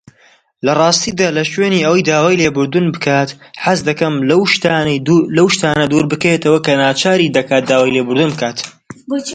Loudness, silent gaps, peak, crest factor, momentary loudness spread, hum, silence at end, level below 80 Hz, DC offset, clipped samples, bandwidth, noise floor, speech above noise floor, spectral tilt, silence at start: -13 LUFS; none; 0 dBFS; 14 dB; 6 LU; none; 0 s; -50 dBFS; under 0.1%; under 0.1%; 9.4 kHz; -50 dBFS; 38 dB; -4.5 dB/octave; 0.65 s